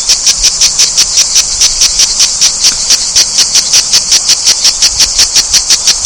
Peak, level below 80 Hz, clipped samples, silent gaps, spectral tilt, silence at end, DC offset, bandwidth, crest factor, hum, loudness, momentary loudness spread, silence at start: 0 dBFS; -32 dBFS; 5%; none; 2.5 dB/octave; 0 s; 0.2%; 16 kHz; 8 dB; none; -5 LUFS; 1 LU; 0 s